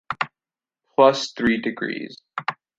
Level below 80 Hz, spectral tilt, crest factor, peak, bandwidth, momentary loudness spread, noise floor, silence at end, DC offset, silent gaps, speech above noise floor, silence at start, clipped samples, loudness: -58 dBFS; -4.5 dB/octave; 22 dB; -2 dBFS; 7.8 kHz; 13 LU; under -90 dBFS; 0.25 s; under 0.1%; none; over 70 dB; 0.1 s; under 0.1%; -22 LUFS